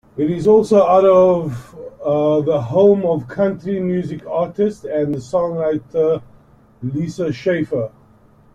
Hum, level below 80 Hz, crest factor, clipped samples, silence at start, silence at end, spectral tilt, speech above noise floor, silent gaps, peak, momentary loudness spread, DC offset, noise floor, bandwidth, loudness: none; -52 dBFS; 16 dB; under 0.1%; 0.15 s; 0.65 s; -8 dB/octave; 33 dB; none; -2 dBFS; 12 LU; under 0.1%; -49 dBFS; 10.5 kHz; -17 LUFS